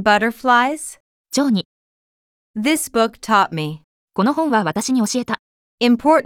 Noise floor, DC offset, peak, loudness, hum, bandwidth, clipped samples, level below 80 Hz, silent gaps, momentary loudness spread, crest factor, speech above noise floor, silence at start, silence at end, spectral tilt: under -90 dBFS; under 0.1%; -2 dBFS; -18 LUFS; none; 17.5 kHz; under 0.1%; -58 dBFS; 1.00-1.24 s, 1.65-2.54 s, 3.84-4.08 s, 5.39-5.78 s; 13 LU; 16 dB; over 73 dB; 0 s; 0.05 s; -4 dB/octave